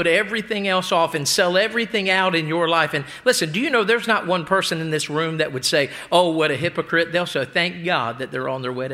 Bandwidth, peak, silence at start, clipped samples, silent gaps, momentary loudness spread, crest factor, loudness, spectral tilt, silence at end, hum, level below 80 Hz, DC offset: 16.5 kHz; 0 dBFS; 0 s; under 0.1%; none; 5 LU; 20 dB; -20 LUFS; -3.5 dB/octave; 0 s; none; -62 dBFS; under 0.1%